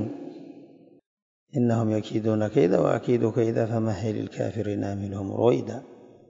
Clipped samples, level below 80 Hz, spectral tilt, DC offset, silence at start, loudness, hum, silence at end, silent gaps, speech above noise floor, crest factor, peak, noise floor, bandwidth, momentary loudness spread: under 0.1%; -64 dBFS; -8 dB/octave; under 0.1%; 0 s; -25 LUFS; none; 0.25 s; 1.06-1.47 s; 26 dB; 20 dB; -6 dBFS; -50 dBFS; 7.6 kHz; 15 LU